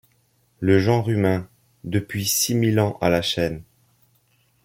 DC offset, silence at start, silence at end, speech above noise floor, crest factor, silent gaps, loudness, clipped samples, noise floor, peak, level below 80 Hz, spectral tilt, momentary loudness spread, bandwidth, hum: under 0.1%; 0.6 s; 1.05 s; 43 dB; 18 dB; none; -21 LUFS; under 0.1%; -64 dBFS; -4 dBFS; -54 dBFS; -5 dB/octave; 8 LU; 16.5 kHz; none